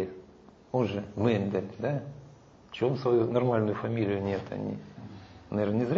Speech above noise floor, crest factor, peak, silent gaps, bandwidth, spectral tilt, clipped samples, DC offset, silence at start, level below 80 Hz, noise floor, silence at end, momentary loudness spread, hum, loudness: 26 dB; 18 dB; -12 dBFS; none; 7.2 kHz; -8.5 dB/octave; under 0.1%; under 0.1%; 0 s; -62 dBFS; -54 dBFS; 0 s; 20 LU; none; -30 LUFS